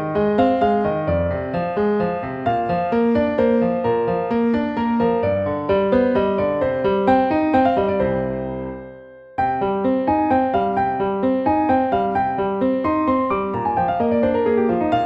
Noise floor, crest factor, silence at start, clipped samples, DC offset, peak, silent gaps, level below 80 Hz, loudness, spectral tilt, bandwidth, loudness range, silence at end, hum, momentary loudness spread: -40 dBFS; 14 dB; 0 s; under 0.1%; under 0.1%; -4 dBFS; none; -44 dBFS; -19 LUFS; -9.5 dB/octave; 5.6 kHz; 2 LU; 0 s; none; 6 LU